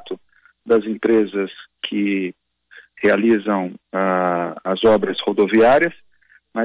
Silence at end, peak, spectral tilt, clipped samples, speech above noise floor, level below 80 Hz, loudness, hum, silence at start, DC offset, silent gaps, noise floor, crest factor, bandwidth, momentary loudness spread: 0 s; -6 dBFS; -9.5 dB/octave; under 0.1%; 38 dB; -56 dBFS; -18 LUFS; none; 0.05 s; under 0.1%; none; -55 dBFS; 12 dB; 4 kHz; 14 LU